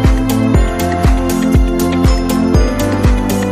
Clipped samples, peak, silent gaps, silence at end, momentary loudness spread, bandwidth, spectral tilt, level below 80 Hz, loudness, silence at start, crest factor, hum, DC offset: under 0.1%; 0 dBFS; none; 0 s; 2 LU; 15.5 kHz; -6.5 dB/octave; -16 dBFS; -13 LUFS; 0 s; 10 dB; none; under 0.1%